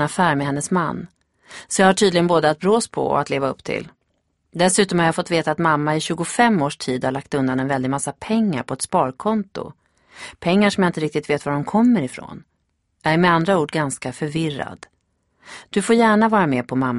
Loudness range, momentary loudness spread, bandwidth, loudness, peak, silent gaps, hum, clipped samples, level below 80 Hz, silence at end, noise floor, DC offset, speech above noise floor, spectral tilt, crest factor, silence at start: 3 LU; 13 LU; 11.5 kHz; -19 LUFS; 0 dBFS; none; none; under 0.1%; -56 dBFS; 0 s; -70 dBFS; under 0.1%; 50 dB; -5 dB/octave; 20 dB; 0 s